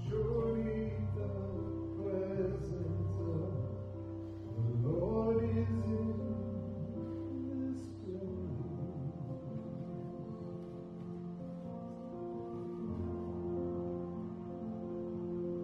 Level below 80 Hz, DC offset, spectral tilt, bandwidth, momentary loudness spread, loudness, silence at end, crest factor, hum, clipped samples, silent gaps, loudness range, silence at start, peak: -54 dBFS; under 0.1%; -10.5 dB/octave; 6.8 kHz; 10 LU; -39 LUFS; 0 s; 16 dB; none; under 0.1%; none; 8 LU; 0 s; -22 dBFS